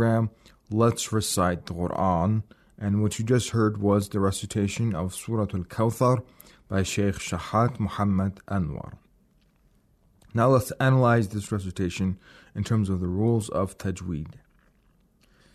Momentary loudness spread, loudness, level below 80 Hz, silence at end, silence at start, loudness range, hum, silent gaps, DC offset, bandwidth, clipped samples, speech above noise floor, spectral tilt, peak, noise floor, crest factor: 10 LU; -26 LUFS; -54 dBFS; 1.25 s; 0 s; 4 LU; none; none; under 0.1%; 13.5 kHz; under 0.1%; 38 dB; -6 dB/octave; -10 dBFS; -63 dBFS; 16 dB